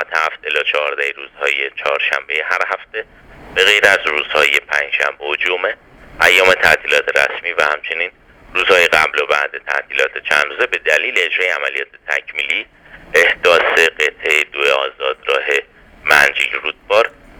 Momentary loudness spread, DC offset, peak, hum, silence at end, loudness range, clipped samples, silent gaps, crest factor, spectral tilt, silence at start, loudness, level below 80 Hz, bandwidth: 10 LU; under 0.1%; 0 dBFS; none; 0.3 s; 3 LU; under 0.1%; none; 16 dB; -1 dB/octave; 0 s; -14 LUFS; -50 dBFS; over 20 kHz